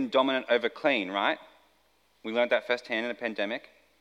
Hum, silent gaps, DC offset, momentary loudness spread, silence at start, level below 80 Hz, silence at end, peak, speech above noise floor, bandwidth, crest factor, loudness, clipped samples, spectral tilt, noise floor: none; none; under 0.1%; 8 LU; 0 s; -80 dBFS; 0.4 s; -10 dBFS; 39 dB; 10.5 kHz; 20 dB; -29 LUFS; under 0.1%; -4.5 dB/octave; -68 dBFS